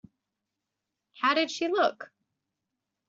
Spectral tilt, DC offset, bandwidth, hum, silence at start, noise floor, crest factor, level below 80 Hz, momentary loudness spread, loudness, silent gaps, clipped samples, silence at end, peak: 0.5 dB/octave; under 0.1%; 7.6 kHz; none; 1.15 s; -86 dBFS; 20 dB; -78 dBFS; 20 LU; -27 LUFS; none; under 0.1%; 1.05 s; -12 dBFS